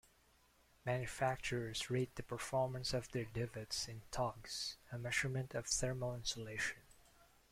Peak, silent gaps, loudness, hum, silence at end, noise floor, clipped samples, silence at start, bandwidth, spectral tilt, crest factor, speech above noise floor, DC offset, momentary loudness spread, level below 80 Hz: -22 dBFS; none; -41 LUFS; none; 0.5 s; -72 dBFS; under 0.1%; 0.85 s; 16 kHz; -3.5 dB/octave; 20 dB; 30 dB; under 0.1%; 6 LU; -62 dBFS